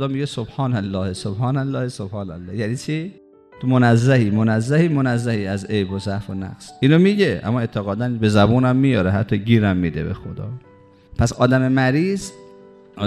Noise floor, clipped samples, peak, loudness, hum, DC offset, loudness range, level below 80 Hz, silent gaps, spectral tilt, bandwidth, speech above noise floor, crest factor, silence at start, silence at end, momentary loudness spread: -45 dBFS; under 0.1%; 0 dBFS; -19 LUFS; none; under 0.1%; 4 LU; -46 dBFS; none; -7 dB/octave; 11.5 kHz; 26 dB; 18 dB; 0 s; 0 s; 14 LU